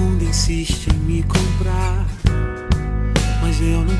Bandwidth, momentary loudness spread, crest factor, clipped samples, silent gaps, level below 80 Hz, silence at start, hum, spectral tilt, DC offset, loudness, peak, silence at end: 11 kHz; 3 LU; 14 dB; under 0.1%; none; -20 dBFS; 0 s; none; -5.5 dB/octave; under 0.1%; -20 LUFS; -2 dBFS; 0 s